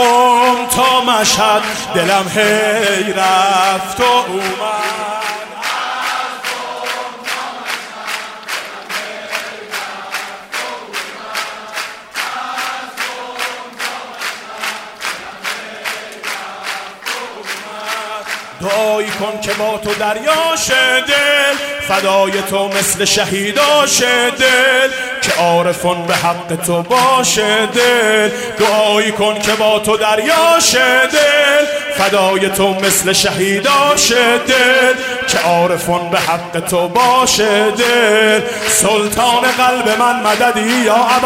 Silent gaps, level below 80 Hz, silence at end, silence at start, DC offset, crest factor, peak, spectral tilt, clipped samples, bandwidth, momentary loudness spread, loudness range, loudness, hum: none; -48 dBFS; 0 s; 0 s; under 0.1%; 14 dB; 0 dBFS; -2 dB/octave; under 0.1%; 16 kHz; 13 LU; 11 LU; -13 LUFS; none